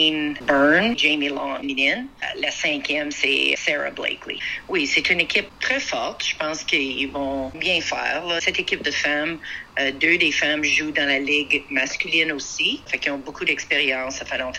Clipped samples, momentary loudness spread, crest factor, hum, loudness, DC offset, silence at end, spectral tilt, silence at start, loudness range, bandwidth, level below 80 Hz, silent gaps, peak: under 0.1%; 8 LU; 20 dB; none; -21 LUFS; under 0.1%; 0 s; -2 dB/octave; 0 s; 3 LU; 12 kHz; -52 dBFS; none; -4 dBFS